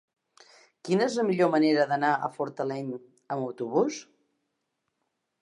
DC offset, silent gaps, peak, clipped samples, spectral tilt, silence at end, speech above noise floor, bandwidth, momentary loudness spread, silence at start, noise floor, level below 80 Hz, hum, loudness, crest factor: under 0.1%; none; -10 dBFS; under 0.1%; -5.5 dB/octave; 1.4 s; 54 dB; 11 kHz; 14 LU; 0.85 s; -80 dBFS; -82 dBFS; none; -27 LUFS; 18 dB